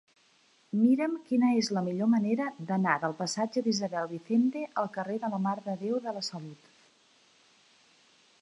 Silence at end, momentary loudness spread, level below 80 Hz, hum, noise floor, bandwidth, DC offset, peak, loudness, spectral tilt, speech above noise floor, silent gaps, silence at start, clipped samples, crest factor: 1.85 s; 9 LU; -82 dBFS; none; -65 dBFS; 11 kHz; under 0.1%; -10 dBFS; -30 LUFS; -5.5 dB/octave; 36 dB; none; 0.75 s; under 0.1%; 20 dB